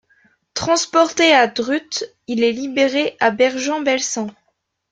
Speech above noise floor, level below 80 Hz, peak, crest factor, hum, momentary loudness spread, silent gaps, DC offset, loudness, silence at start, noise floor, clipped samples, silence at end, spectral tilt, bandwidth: 52 dB; -60 dBFS; -2 dBFS; 18 dB; none; 13 LU; none; under 0.1%; -17 LUFS; 0.55 s; -69 dBFS; under 0.1%; 0.6 s; -2.5 dB/octave; 9.4 kHz